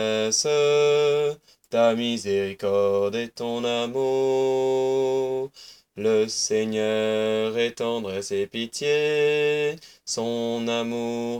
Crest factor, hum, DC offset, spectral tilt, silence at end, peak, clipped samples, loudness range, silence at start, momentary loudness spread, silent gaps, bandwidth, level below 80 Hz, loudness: 14 dB; none; under 0.1%; -3.5 dB/octave; 0 s; -8 dBFS; under 0.1%; 2 LU; 0 s; 8 LU; none; 15.5 kHz; -68 dBFS; -24 LUFS